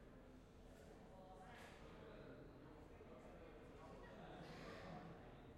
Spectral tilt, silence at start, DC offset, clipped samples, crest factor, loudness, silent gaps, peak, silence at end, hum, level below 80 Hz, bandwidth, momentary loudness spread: -6 dB/octave; 0 s; under 0.1%; under 0.1%; 16 dB; -60 LUFS; none; -44 dBFS; 0 s; none; -68 dBFS; 13 kHz; 7 LU